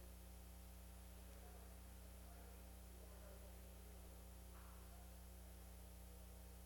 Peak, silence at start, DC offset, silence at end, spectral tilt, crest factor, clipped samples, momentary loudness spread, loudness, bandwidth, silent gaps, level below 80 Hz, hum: -46 dBFS; 0 s; under 0.1%; 0 s; -4.5 dB/octave; 12 dB; under 0.1%; 1 LU; -60 LUFS; 17.5 kHz; none; -60 dBFS; 60 Hz at -60 dBFS